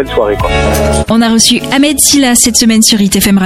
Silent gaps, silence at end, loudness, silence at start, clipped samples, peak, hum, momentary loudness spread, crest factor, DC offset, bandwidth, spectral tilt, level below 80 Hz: none; 0 s; -7 LUFS; 0 s; 0.2%; 0 dBFS; none; 5 LU; 8 dB; under 0.1%; 17 kHz; -3 dB/octave; -22 dBFS